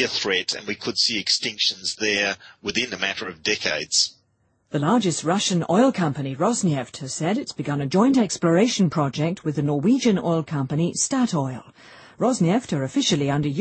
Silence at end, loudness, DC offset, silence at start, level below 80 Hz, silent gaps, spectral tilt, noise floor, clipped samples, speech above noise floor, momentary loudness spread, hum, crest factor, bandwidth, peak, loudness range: 0 s; -22 LUFS; under 0.1%; 0 s; -60 dBFS; none; -4 dB/octave; -67 dBFS; under 0.1%; 44 dB; 8 LU; none; 16 dB; 8.8 kHz; -6 dBFS; 2 LU